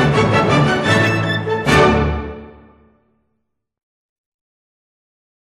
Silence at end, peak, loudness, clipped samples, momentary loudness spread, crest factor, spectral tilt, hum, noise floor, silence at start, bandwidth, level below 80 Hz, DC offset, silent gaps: 2.95 s; -2 dBFS; -15 LUFS; under 0.1%; 12 LU; 16 dB; -6 dB/octave; none; -73 dBFS; 0 s; 12.5 kHz; -34 dBFS; under 0.1%; none